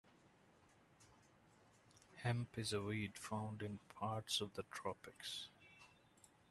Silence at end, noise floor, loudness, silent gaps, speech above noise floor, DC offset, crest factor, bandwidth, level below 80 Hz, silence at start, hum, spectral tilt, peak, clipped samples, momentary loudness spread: 0.25 s; -71 dBFS; -46 LUFS; none; 26 dB; under 0.1%; 22 dB; 13 kHz; -78 dBFS; 0.05 s; none; -4.5 dB/octave; -26 dBFS; under 0.1%; 21 LU